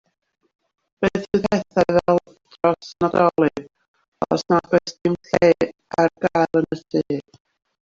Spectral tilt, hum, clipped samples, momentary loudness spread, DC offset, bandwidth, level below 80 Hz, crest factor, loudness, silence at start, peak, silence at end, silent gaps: -6.5 dB/octave; none; under 0.1%; 7 LU; under 0.1%; 7.6 kHz; -54 dBFS; 18 dB; -20 LUFS; 1 s; -2 dBFS; 0.6 s; 3.88-3.94 s, 4.08-4.12 s